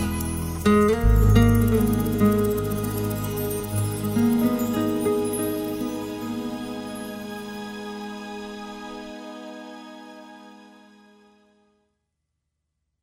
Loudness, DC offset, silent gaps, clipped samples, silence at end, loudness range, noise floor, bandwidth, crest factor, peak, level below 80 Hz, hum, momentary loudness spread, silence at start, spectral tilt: -24 LUFS; under 0.1%; none; under 0.1%; 2.4 s; 20 LU; -79 dBFS; 16 kHz; 20 dB; -6 dBFS; -32 dBFS; none; 19 LU; 0 s; -6.5 dB/octave